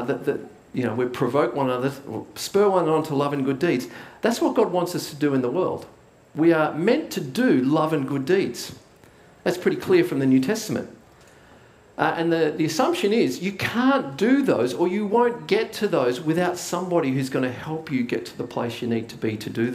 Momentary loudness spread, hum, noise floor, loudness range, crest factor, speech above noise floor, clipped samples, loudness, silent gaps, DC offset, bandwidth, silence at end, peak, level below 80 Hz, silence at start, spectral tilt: 9 LU; none; -51 dBFS; 3 LU; 20 dB; 29 dB; under 0.1%; -23 LUFS; none; under 0.1%; 16 kHz; 0 s; -4 dBFS; -64 dBFS; 0 s; -5.5 dB/octave